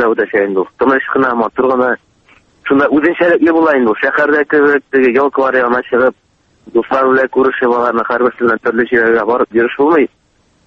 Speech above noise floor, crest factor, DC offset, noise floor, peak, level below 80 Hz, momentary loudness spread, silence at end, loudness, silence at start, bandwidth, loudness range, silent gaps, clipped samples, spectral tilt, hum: 37 dB; 12 dB; under 0.1%; -49 dBFS; 0 dBFS; -52 dBFS; 4 LU; 0.6 s; -12 LUFS; 0 s; 6.4 kHz; 2 LU; none; under 0.1%; -7.5 dB/octave; none